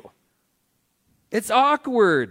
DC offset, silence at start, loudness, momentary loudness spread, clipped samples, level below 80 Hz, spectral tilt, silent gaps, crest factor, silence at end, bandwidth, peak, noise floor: under 0.1%; 0.05 s; -20 LUFS; 10 LU; under 0.1%; -70 dBFS; -4.5 dB/octave; none; 18 dB; 0 s; 16.5 kHz; -4 dBFS; -70 dBFS